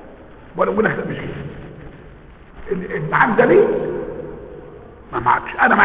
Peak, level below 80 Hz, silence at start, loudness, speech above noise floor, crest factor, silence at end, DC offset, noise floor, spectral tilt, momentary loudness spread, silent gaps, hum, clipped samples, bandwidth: -2 dBFS; -44 dBFS; 0 s; -18 LUFS; 25 dB; 18 dB; 0 s; 0.1%; -41 dBFS; -10 dB/octave; 24 LU; none; none; under 0.1%; 4 kHz